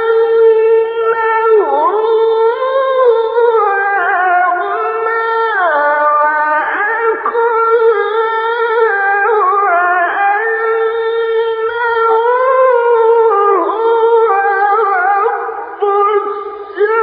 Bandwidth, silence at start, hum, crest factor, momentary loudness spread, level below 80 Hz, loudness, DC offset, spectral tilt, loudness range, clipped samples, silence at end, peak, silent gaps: 4.8 kHz; 0 s; none; 12 dB; 5 LU; -62 dBFS; -12 LUFS; under 0.1%; -6 dB/octave; 2 LU; under 0.1%; 0 s; 0 dBFS; none